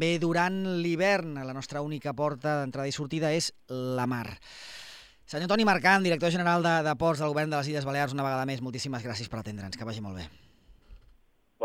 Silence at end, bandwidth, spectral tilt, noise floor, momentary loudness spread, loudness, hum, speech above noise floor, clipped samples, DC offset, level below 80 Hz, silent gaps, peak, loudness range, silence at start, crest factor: 0 s; 16 kHz; -5 dB/octave; -63 dBFS; 16 LU; -29 LUFS; none; 35 dB; under 0.1%; under 0.1%; -60 dBFS; none; -8 dBFS; 8 LU; 0 s; 20 dB